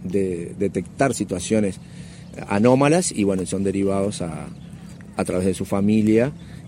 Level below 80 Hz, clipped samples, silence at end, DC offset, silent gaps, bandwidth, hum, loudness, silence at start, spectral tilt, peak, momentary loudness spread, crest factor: -50 dBFS; under 0.1%; 0 s; under 0.1%; none; 15.5 kHz; none; -21 LUFS; 0 s; -6 dB/octave; -2 dBFS; 20 LU; 20 dB